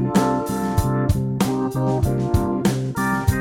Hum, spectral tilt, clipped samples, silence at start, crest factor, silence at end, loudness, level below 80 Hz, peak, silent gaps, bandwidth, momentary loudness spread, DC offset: none; -6.5 dB/octave; under 0.1%; 0 s; 16 dB; 0 s; -21 LUFS; -32 dBFS; -4 dBFS; none; 17 kHz; 2 LU; under 0.1%